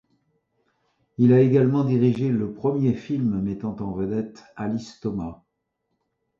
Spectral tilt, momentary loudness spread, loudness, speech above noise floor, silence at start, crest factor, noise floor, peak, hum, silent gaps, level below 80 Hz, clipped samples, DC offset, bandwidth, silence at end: -9.5 dB/octave; 14 LU; -23 LUFS; 55 dB; 1.2 s; 18 dB; -77 dBFS; -6 dBFS; none; none; -54 dBFS; under 0.1%; under 0.1%; 7.4 kHz; 1.05 s